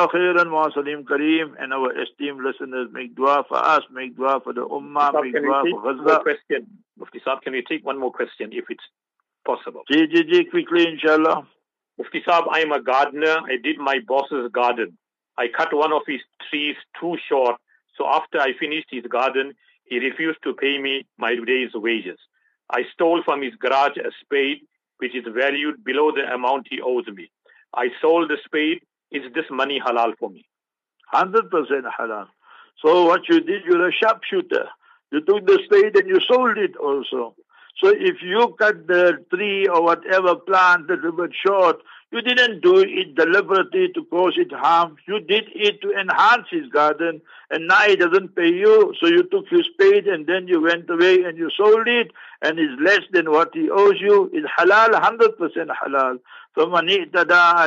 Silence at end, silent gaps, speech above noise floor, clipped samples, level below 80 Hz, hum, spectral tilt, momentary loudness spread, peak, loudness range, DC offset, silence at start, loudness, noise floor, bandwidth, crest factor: 0 s; none; 62 dB; under 0.1%; -78 dBFS; none; -5 dB/octave; 13 LU; -4 dBFS; 6 LU; under 0.1%; 0 s; -19 LUFS; -81 dBFS; 7.6 kHz; 16 dB